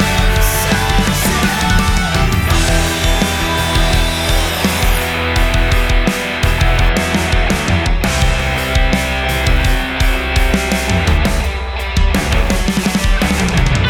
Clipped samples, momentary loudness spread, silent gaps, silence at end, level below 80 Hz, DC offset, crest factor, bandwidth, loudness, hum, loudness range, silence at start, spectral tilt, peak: under 0.1%; 2 LU; none; 0 s; -16 dBFS; under 0.1%; 12 dB; 18 kHz; -14 LUFS; none; 1 LU; 0 s; -4 dB/octave; -2 dBFS